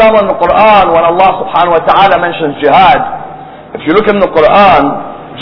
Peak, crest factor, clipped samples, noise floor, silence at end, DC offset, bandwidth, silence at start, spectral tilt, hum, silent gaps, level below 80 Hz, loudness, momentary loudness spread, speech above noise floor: 0 dBFS; 8 dB; 3%; -27 dBFS; 0 s; under 0.1%; 5.4 kHz; 0 s; -7.5 dB/octave; none; none; -36 dBFS; -7 LUFS; 14 LU; 20 dB